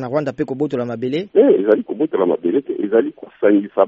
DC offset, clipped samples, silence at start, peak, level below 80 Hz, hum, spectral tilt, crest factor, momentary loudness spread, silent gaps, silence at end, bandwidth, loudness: under 0.1%; under 0.1%; 0 s; 0 dBFS; -64 dBFS; none; -6.5 dB/octave; 16 dB; 9 LU; none; 0 s; 7.2 kHz; -18 LUFS